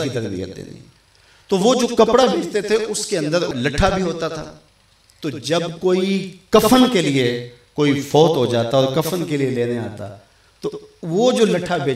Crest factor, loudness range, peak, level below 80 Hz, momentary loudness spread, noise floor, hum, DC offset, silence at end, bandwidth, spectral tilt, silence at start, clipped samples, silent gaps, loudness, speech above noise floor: 18 dB; 5 LU; -2 dBFS; -40 dBFS; 16 LU; -54 dBFS; none; under 0.1%; 0 s; 16 kHz; -5 dB/octave; 0 s; under 0.1%; none; -18 LUFS; 36 dB